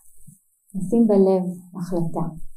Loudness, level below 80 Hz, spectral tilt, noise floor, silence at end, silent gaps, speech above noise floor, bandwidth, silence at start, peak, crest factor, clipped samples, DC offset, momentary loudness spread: -21 LUFS; -46 dBFS; -9.5 dB/octave; -49 dBFS; 0 s; none; 28 dB; 13 kHz; 0.05 s; -6 dBFS; 16 dB; under 0.1%; under 0.1%; 16 LU